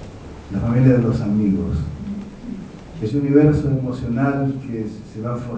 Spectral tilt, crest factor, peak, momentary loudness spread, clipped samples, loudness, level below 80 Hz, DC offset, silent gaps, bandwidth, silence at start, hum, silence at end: -9.5 dB/octave; 18 dB; -2 dBFS; 18 LU; under 0.1%; -20 LUFS; -38 dBFS; under 0.1%; none; 8.2 kHz; 0 s; none; 0 s